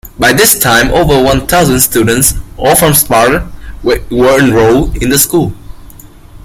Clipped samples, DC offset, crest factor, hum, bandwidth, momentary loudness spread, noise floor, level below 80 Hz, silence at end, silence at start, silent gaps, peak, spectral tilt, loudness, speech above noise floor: 0.4%; under 0.1%; 10 dB; none; over 20 kHz; 8 LU; -32 dBFS; -24 dBFS; 0.05 s; 0.05 s; none; 0 dBFS; -3.5 dB/octave; -8 LUFS; 25 dB